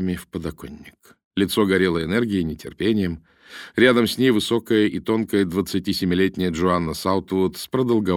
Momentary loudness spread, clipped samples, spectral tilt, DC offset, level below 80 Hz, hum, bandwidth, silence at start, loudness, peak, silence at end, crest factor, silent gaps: 13 LU; under 0.1%; -5.5 dB/octave; under 0.1%; -48 dBFS; none; 18 kHz; 0 s; -21 LUFS; -4 dBFS; 0 s; 18 dB; 1.24-1.31 s